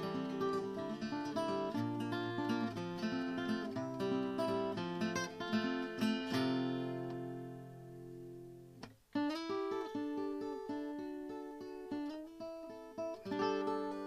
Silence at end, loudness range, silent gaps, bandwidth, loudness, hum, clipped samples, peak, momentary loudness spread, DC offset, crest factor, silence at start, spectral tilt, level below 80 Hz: 0 s; 5 LU; none; 15 kHz; -40 LUFS; none; under 0.1%; -24 dBFS; 13 LU; under 0.1%; 16 dB; 0 s; -6 dB/octave; -74 dBFS